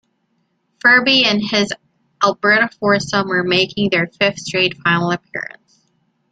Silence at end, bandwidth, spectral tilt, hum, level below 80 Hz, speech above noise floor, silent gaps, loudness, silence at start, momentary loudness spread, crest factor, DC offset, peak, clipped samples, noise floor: 0.85 s; 9.2 kHz; -4 dB/octave; none; -56 dBFS; 50 dB; none; -15 LUFS; 0.85 s; 11 LU; 16 dB; under 0.1%; 0 dBFS; under 0.1%; -66 dBFS